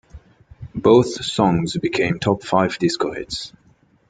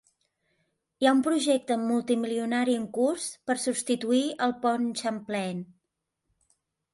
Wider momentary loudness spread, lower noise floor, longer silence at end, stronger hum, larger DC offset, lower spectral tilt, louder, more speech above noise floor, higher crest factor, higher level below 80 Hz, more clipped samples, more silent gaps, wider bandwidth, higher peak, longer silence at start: first, 14 LU vs 8 LU; second, -56 dBFS vs -83 dBFS; second, 0.6 s vs 1.3 s; neither; neither; first, -5.5 dB/octave vs -4 dB/octave; first, -19 LUFS vs -27 LUFS; second, 38 dB vs 56 dB; about the same, 18 dB vs 20 dB; first, -48 dBFS vs -74 dBFS; neither; neither; second, 9.4 kHz vs 11.5 kHz; first, -2 dBFS vs -10 dBFS; second, 0.15 s vs 1 s